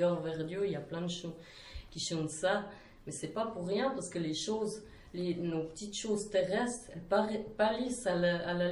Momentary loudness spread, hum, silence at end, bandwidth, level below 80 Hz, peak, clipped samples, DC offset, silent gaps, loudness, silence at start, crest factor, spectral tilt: 14 LU; none; 0 s; 11.5 kHz; -60 dBFS; -18 dBFS; under 0.1%; under 0.1%; none; -35 LUFS; 0 s; 18 dB; -4.5 dB/octave